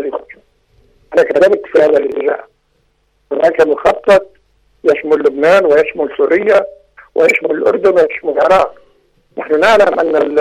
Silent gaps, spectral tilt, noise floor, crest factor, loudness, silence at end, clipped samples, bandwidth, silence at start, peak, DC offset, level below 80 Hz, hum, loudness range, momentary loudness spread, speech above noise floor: none; -5 dB/octave; -59 dBFS; 12 dB; -12 LUFS; 0 s; under 0.1%; 12 kHz; 0 s; -2 dBFS; under 0.1%; -48 dBFS; none; 3 LU; 10 LU; 48 dB